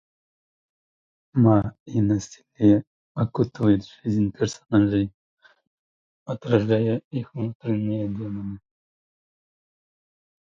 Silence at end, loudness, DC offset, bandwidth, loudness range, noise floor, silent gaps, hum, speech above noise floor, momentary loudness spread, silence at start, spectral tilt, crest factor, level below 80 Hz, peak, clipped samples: 1.9 s; -24 LUFS; under 0.1%; 7.6 kHz; 6 LU; under -90 dBFS; 1.80-1.86 s, 2.87-3.15 s, 5.14-5.37 s, 5.67-6.26 s, 7.04-7.11 s, 7.55-7.60 s; none; over 68 dB; 14 LU; 1.35 s; -8 dB/octave; 20 dB; -52 dBFS; -4 dBFS; under 0.1%